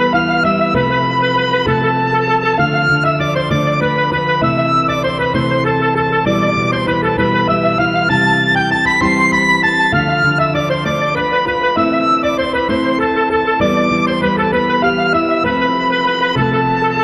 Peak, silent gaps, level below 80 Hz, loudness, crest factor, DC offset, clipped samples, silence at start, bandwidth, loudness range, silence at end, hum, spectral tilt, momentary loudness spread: -2 dBFS; none; -40 dBFS; -14 LUFS; 14 dB; under 0.1%; under 0.1%; 0 s; 12.5 kHz; 2 LU; 0 s; none; -6 dB/octave; 3 LU